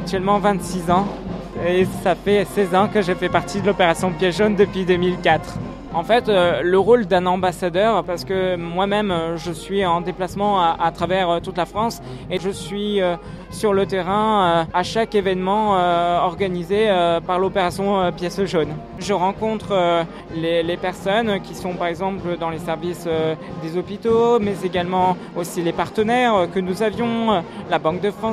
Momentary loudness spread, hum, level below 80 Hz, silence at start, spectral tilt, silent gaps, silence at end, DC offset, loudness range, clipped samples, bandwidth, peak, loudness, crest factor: 8 LU; none; -44 dBFS; 0 s; -5.5 dB/octave; none; 0 s; under 0.1%; 4 LU; under 0.1%; 15 kHz; -2 dBFS; -20 LUFS; 18 dB